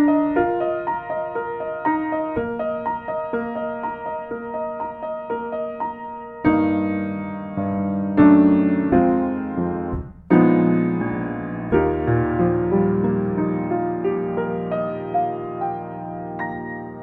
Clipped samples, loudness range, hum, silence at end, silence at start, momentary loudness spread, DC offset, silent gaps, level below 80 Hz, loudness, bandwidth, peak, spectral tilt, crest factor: under 0.1%; 8 LU; none; 0 s; 0 s; 12 LU; under 0.1%; none; -44 dBFS; -22 LUFS; 4.1 kHz; -2 dBFS; -11.5 dB/octave; 20 dB